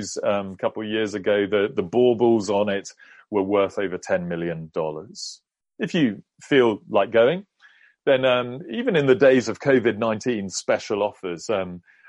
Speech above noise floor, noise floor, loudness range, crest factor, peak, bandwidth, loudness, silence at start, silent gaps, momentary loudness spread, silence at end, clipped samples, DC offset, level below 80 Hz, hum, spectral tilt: 33 dB; -55 dBFS; 5 LU; 18 dB; -4 dBFS; 11 kHz; -22 LUFS; 0 s; none; 12 LU; 0.3 s; under 0.1%; under 0.1%; -64 dBFS; none; -5 dB/octave